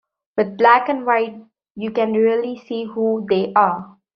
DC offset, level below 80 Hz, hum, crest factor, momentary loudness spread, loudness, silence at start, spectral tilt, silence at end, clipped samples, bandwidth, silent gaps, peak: under 0.1%; -66 dBFS; none; 18 dB; 13 LU; -18 LUFS; 0.35 s; -3.5 dB/octave; 0.3 s; under 0.1%; 6 kHz; 1.71-1.75 s; -2 dBFS